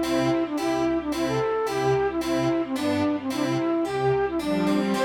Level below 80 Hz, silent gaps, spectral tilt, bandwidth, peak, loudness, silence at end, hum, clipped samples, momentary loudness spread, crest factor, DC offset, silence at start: -52 dBFS; none; -6 dB/octave; 18 kHz; -12 dBFS; -25 LUFS; 0 s; none; under 0.1%; 2 LU; 12 dB; under 0.1%; 0 s